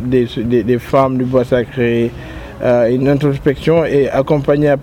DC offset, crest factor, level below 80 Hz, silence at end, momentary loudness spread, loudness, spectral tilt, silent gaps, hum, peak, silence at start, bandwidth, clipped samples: under 0.1%; 12 dB; -36 dBFS; 0 s; 4 LU; -14 LUFS; -8 dB/octave; none; none; 0 dBFS; 0 s; 16 kHz; under 0.1%